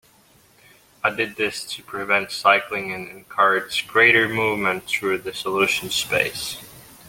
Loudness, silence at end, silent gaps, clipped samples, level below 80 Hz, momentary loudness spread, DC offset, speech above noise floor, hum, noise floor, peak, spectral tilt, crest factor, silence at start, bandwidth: -20 LUFS; 0 s; none; under 0.1%; -60 dBFS; 15 LU; under 0.1%; 34 dB; none; -55 dBFS; -2 dBFS; -2.5 dB/octave; 20 dB; 1.05 s; 17 kHz